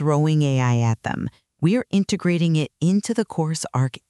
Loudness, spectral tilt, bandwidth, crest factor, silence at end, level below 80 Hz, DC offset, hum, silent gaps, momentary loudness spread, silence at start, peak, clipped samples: -21 LUFS; -6.5 dB/octave; 12 kHz; 14 dB; 0.1 s; -56 dBFS; under 0.1%; none; none; 6 LU; 0 s; -8 dBFS; under 0.1%